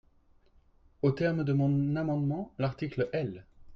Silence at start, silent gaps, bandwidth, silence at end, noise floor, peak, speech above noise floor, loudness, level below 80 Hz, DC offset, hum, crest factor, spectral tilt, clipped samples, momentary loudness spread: 1.05 s; none; 6.2 kHz; 0 s; -63 dBFS; -16 dBFS; 34 dB; -31 LUFS; -60 dBFS; under 0.1%; none; 16 dB; -9.5 dB/octave; under 0.1%; 7 LU